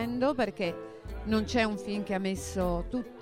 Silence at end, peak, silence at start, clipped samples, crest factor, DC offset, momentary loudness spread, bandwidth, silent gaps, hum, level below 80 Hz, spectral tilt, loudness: 0 s; -12 dBFS; 0 s; under 0.1%; 18 dB; under 0.1%; 9 LU; 16 kHz; none; none; -44 dBFS; -5.5 dB/octave; -31 LUFS